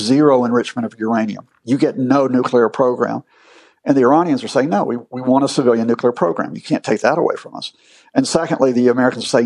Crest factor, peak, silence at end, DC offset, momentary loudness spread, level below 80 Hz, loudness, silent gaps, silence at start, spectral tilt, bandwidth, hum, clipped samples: 14 dB; -2 dBFS; 0 s; under 0.1%; 11 LU; -62 dBFS; -16 LUFS; none; 0 s; -5.5 dB/octave; 11 kHz; none; under 0.1%